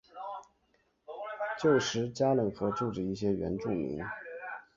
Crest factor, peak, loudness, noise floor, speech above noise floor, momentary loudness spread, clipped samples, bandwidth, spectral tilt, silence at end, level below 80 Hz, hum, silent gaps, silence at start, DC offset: 18 dB; -14 dBFS; -32 LUFS; -73 dBFS; 42 dB; 15 LU; under 0.1%; 7.6 kHz; -5.5 dB/octave; 0.15 s; -60 dBFS; none; none; 0.15 s; under 0.1%